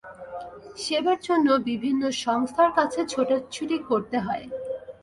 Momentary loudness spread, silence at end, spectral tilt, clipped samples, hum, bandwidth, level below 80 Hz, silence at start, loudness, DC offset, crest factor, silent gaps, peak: 15 LU; 0.1 s; -4 dB/octave; under 0.1%; none; 11.5 kHz; -62 dBFS; 0.05 s; -25 LUFS; under 0.1%; 18 dB; none; -8 dBFS